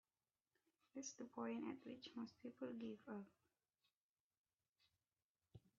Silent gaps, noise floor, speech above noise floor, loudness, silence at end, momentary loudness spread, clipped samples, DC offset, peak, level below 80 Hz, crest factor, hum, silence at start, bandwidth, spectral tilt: 3.96-4.30 s, 4.37-4.44 s, 5.24-5.35 s; under -90 dBFS; over 37 dB; -53 LUFS; 0.2 s; 7 LU; under 0.1%; under 0.1%; -36 dBFS; under -90 dBFS; 20 dB; none; 0.95 s; 7 kHz; -4.5 dB/octave